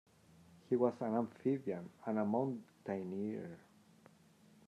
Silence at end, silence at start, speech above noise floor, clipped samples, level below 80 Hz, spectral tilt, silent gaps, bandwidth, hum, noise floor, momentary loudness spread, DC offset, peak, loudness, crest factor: 1.05 s; 0.7 s; 28 dB; under 0.1%; -86 dBFS; -9 dB/octave; none; 11.5 kHz; none; -66 dBFS; 12 LU; under 0.1%; -20 dBFS; -39 LUFS; 20 dB